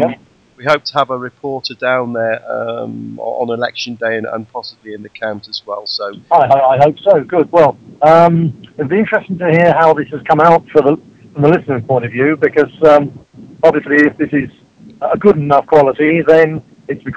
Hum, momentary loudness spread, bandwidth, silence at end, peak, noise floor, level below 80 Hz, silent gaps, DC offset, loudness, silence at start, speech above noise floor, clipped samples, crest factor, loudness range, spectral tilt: none; 14 LU; 8 kHz; 0 s; 0 dBFS; -32 dBFS; -52 dBFS; none; under 0.1%; -13 LUFS; 0 s; 20 dB; 0.4%; 12 dB; 8 LU; -7.5 dB/octave